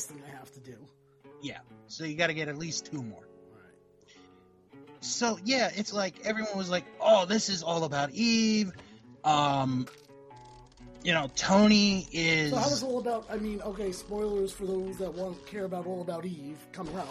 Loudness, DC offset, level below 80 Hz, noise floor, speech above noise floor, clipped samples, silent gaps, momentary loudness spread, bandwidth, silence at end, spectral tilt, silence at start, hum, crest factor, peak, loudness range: -29 LUFS; under 0.1%; -58 dBFS; -59 dBFS; 29 dB; under 0.1%; none; 18 LU; 13.5 kHz; 0 s; -4 dB/octave; 0 s; none; 20 dB; -10 dBFS; 9 LU